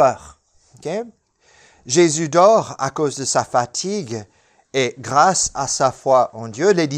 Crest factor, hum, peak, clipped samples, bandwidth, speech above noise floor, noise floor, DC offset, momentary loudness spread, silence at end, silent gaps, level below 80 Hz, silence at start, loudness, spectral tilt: 18 dB; none; 0 dBFS; under 0.1%; 12.5 kHz; 36 dB; -53 dBFS; under 0.1%; 14 LU; 0 s; none; -54 dBFS; 0 s; -18 LUFS; -4 dB/octave